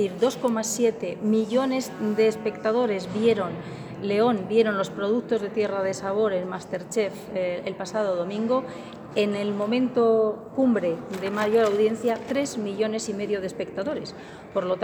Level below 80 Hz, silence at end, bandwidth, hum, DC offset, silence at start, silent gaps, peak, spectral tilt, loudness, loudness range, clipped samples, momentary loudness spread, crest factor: -64 dBFS; 0 s; over 20 kHz; none; under 0.1%; 0 s; none; -8 dBFS; -5 dB/octave; -25 LUFS; 4 LU; under 0.1%; 9 LU; 16 dB